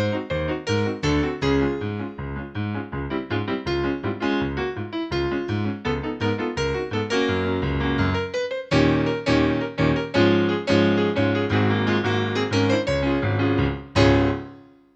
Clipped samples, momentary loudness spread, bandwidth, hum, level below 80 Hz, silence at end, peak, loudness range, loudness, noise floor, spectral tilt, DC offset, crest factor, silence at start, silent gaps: under 0.1%; 9 LU; 8.4 kHz; none; -38 dBFS; 0.35 s; -4 dBFS; 5 LU; -23 LUFS; -45 dBFS; -6.5 dB/octave; under 0.1%; 18 dB; 0 s; none